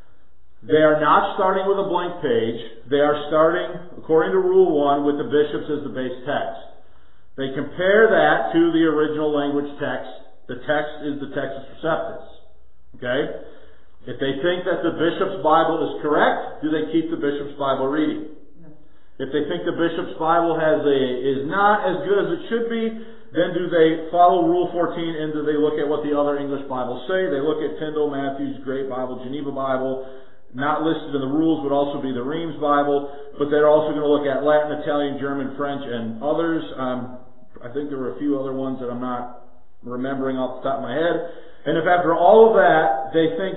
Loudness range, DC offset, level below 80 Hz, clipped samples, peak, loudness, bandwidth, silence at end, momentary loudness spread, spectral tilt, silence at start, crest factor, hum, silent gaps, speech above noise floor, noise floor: 7 LU; 2%; -58 dBFS; under 0.1%; -2 dBFS; -21 LUFS; 4.1 kHz; 0 s; 13 LU; -10.5 dB/octave; 0.65 s; 20 dB; none; none; 37 dB; -57 dBFS